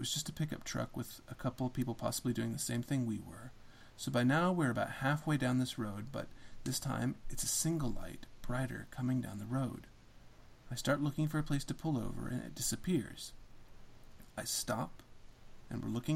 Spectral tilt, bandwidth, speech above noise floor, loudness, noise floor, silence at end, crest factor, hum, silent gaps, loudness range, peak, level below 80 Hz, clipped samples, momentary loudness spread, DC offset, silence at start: -4.5 dB/octave; 16.5 kHz; 20 dB; -37 LUFS; -57 dBFS; 0 s; 18 dB; none; none; 5 LU; -20 dBFS; -54 dBFS; under 0.1%; 13 LU; under 0.1%; 0 s